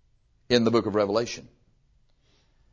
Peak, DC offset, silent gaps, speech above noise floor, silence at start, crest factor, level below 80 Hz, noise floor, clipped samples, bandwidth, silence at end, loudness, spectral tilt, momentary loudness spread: -6 dBFS; under 0.1%; none; 40 dB; 0.5 s; 22 dB; -58 dBFS; -64 dBFS; under 0.1%; 7.6 kHz; 1.25 s; -25 LUFS; -5 dB/octave; 11 LU